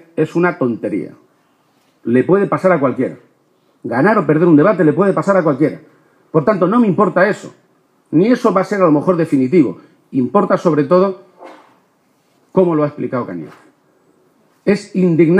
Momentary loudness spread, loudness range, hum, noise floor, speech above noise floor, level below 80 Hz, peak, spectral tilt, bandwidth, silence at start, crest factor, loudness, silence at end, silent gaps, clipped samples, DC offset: 10 LU; 5 LU; none; -58 dBFS; 44 dB; -64 dBFS; 0 dBFS; -8.5 dB/octave; 10.5 kHz; 0.15 s; 14 dB; -14 LUFS; 0 s; none; under 0.1%; under 0.1%